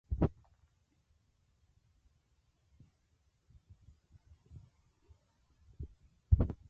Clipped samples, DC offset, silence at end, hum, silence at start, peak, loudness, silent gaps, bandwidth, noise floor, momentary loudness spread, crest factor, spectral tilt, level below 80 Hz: under 0.1%; under 0.1%; 0.15 s; none; 0.1 s; -14 dBFS; -35 LUFS; none; 3.5 kHz; -75 dBFS; 26 LU; 28 dB; -11 dB/octave; -44 dBFS